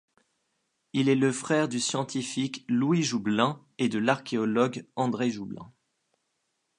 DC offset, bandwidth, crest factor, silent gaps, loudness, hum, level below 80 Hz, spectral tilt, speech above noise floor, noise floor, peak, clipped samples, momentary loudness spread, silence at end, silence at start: under 0.1%; 11 kHz; 22 dB; none; -27 LUFS; none; -72 dBFS; -5 dB/octave; 51 dB; -78 dBFS; -6 dBFS; under 0.1%; 6 LU; 1.1 s; 0.95 s